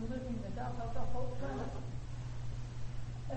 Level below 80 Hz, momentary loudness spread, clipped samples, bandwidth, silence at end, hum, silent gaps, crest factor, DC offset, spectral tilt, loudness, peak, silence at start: -46 dBFS; 4 LU; under 0.1%; 8.4 kHz; 0 s; none; none; 14 dB; under 0.1%; -7.5 dB/octave; -43 LUFS; -22 dBFS; 0 s